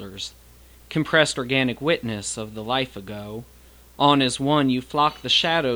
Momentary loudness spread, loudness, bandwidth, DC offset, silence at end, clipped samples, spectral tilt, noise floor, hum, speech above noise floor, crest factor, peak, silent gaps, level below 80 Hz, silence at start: 16 LU; -21 LUFS; over 20 kHz; under 0.1%; 0 s; under 0.1%; -4 dB/octave; -45 dBFS; none; 23 dB; 20 dB; -2 dBFS; none; -52 dBFS; 0 s